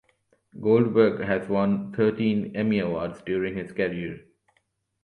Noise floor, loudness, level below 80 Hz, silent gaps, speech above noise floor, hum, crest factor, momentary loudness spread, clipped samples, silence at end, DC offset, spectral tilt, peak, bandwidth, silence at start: -72 dBFS; -25 LUFS; -58 dBFS; none; 48 dB; none; 20 dB; 10 LU; under 0.1%; 0.85 s; under 0.1%; -9 dB/octave; -6 dBFS; 4.5 kHz; 0.55 s